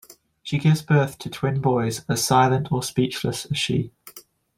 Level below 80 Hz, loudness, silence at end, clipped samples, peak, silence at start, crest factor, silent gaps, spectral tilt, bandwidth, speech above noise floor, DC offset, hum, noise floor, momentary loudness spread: -54 dBFS; -22 LUFS; 0.4 s; under 0.1%; -4 dBFS; 0.1 s; 18 dB; none; -5 dB/octave; 16.5 kHz; 25 dB; under 0.1%; none; -47 dBFS; 9 LU